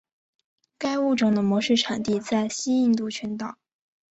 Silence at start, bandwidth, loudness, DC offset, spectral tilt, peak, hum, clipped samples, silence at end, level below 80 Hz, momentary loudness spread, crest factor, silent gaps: 0.8 s; 8.2 kHz; -24 LUFS; under 0.1%; -4.5 dB/octave; -10 dBFS; none; under 0.1%; 0.6 s; -64 dBFS; 10 LU; 16 dB; none